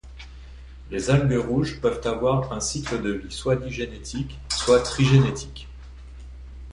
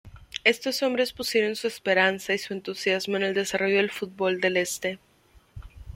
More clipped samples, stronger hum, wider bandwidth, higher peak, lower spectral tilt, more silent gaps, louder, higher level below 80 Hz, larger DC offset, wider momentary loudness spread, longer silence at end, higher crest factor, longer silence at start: neither; neither; second, 11 kHz vs 16.5 kHz; about the same, -6 dBFS vs -4 dBFS; first, -5.5 dB/octave vs -3 dB/octave; neither; about the same, -24 LUFS vs -25 LUFS; first, -40 dBFS vs -54 dBFS; neither; first, 24 LU vs 9 LU; about the same, 0 s vs 0 s; about the same, 18 dB vs 22 dB; about the same, 0.05 s vs 0.05 s